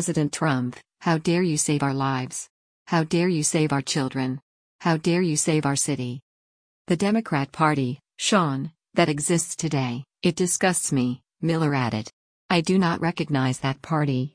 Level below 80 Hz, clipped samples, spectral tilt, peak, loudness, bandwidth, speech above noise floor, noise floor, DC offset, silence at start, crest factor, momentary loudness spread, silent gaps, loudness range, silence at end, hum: -60 dBFS; under 0.1%; -4.5 dB/octave; -6 dBFS; -24 LUFS; 10.5 kHz; over 67 dB; under -90 dBFS; under 0.1%; 0 s; 18 dB; 8 LU; 2.50-2.86 s, 4.42-4.79 s, 6.22-6.85 s, 12.13-12.49 s; 1 LU; 0.05 s; none